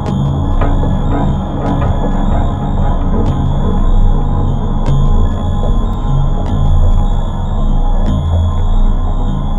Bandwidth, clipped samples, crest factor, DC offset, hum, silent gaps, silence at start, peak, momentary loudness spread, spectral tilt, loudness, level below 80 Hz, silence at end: 7.2 kHz; under 0.1%; 10 dB; under 0.1%; none; none; 0 s; 0 dBFS; 3 LU; -8.5 dB/octave; -16 LUFS; -12 dBFS; 0 s